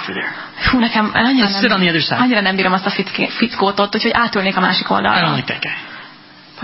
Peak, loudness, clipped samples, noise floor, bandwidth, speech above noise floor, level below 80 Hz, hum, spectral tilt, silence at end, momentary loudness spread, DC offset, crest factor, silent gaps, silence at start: 0 dBFS; -15 LUFS; under 0.1%; -41 dBFS; 5.8 kHz; 25 dB; -40 dBFS; none; -8.5 dB/octave; 0 s; 9 LU; under 0.1%; 16 dB; none; 0 s